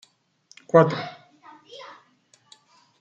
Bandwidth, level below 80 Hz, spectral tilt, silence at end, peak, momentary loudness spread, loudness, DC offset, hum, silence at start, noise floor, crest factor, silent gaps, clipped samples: 8 kHz; -70 dBFS; -7.5 dB/octave; 1.2 s; -2 dBFS; 27 LU; -20 LUFS; under 0.1%; none; 0.75 s; -61 dBFS; 24 dB; none; under 0.1%